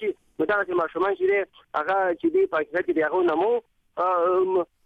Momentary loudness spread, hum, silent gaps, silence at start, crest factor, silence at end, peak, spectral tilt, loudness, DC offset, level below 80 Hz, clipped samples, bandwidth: 7 LU; none; none; 0 s; 12 dB; 0.2 s; -12 dBFS; -7 dB/octave; -24 LUFS; under 0.1%; -64 dBFS; under 0.1%; 4.7 kHz